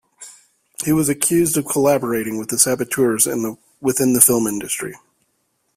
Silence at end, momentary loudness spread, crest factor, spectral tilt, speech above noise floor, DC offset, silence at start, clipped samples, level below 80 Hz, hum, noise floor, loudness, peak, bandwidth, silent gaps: 0.8 s; 12 LU; 20 dB; -4 dB/octave; 50 dB; under 0.1%; 0.2 s; under 0.1%; -56 dBFS; none; -68 dBFS; -17 LUFS; 0 dBFS; 16 kHz; none